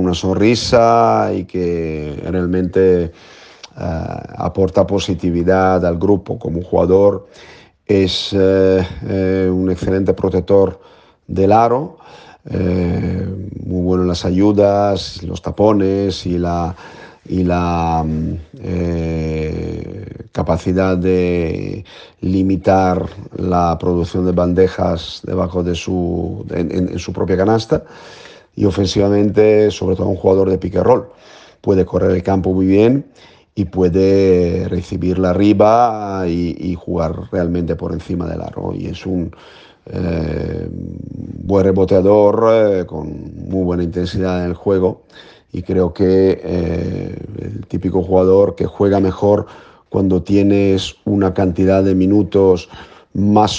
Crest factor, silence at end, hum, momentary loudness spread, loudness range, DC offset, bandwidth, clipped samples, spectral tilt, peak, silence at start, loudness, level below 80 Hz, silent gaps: 16 dB; 0 s; none; 13 LU; 5 LU; under 0.1%; 8.6 kHz; under 0.1%; -7.5 dB/octave; 0 dBFS; 0 s; -16 LUFS; -42 dBFS; none